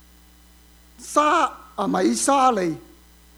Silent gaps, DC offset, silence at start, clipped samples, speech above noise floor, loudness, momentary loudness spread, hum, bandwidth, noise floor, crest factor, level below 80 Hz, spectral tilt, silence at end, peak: none; under 0.1%; 1 s; under 0.1%; 31 dB; -21 LUFS; 11 LU; none; over 20 kHz; -51 dBFS; 20 dB; -54 dBFS; -3.5 dB/octave; 0.55 s; -4 dBFS